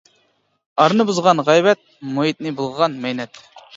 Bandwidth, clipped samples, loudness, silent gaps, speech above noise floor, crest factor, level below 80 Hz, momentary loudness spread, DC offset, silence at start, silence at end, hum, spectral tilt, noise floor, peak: 8 kHz; under 0.1%; -18 LUFS; none; 46 dB; 18 dB; -66 dBFS; 13 LU; under 0.1%; 0.75 s; 0.15 s; none; -5 dB/octave; -63 dBFS; 0 dBFS